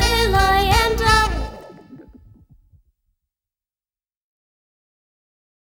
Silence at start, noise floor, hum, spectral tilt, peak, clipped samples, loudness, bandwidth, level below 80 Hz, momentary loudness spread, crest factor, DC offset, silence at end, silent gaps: 0 s; under -90 dBFS; none; -3.5 dB/octave; -2 dBFS; under 0.1%; -17 LUFS; 19 kHz; -30 dBFS; 11 LU; 20 dB; under 0.1%; 3.8 s; none